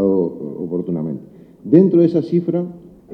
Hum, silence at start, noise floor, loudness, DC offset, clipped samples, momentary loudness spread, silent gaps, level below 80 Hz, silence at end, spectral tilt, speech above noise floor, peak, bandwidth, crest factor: none; 0 s; -38 dBFS; -17 LUFS; under 0.1%; under 0.1%; 16 LU; none; -58 dBFS; 0 s; -11.5 dB/octave; 24 dB; 0 dBFS; 5.2 kHz; 18 dB